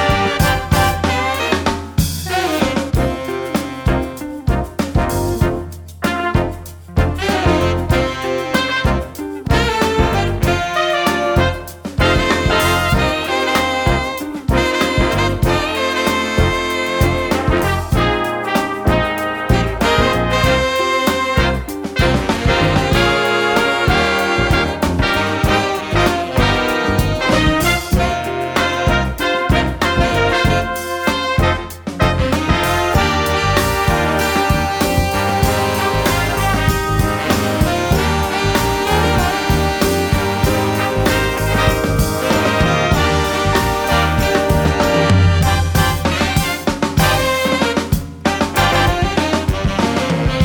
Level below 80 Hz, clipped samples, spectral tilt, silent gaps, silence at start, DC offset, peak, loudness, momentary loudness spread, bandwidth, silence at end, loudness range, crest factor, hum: -24 dBFS; under 0.1%; -5 dB/octave; none; 0 s; under 0.1%; 0 dBFS; -16 LUFS; 5 LU; over 20 kHz; 0 s; 3 LU; 16 dB; none